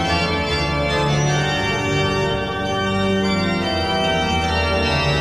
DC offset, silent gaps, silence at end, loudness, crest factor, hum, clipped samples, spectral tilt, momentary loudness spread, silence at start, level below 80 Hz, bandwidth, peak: 0.4%; none; 0 s; -19 LUFS; 12 dB; none; under 0.1%; -5 dB/octave; 2 LU; 0 s; -32 dBFS; 14.5 kHz; -6 dBFS